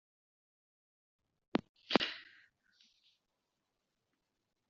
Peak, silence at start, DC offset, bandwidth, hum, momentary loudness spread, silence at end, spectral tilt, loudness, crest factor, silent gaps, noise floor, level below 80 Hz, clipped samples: -10 dBFS; 1.55 s; under 0.1%; 7.2 kHz; none; 8 LU; 2.45 s; -2 dB/octave; -37 LUFS; 36 dB; 1.69-1.74 s; -86 dBFS; -78 dBFS; under 0.1%